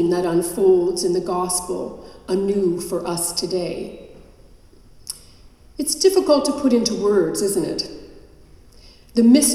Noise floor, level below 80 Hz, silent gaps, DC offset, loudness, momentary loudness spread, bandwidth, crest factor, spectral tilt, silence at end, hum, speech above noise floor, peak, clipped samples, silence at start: -47 dBFS; -50 dBFS; none; under 0.1%; -20 LUFS; 17 LU; 15 kHz; 18 dB; -4 dB/octave; 0 s; none; 28 dB; -2 dBFS; under 0.1%; 0 s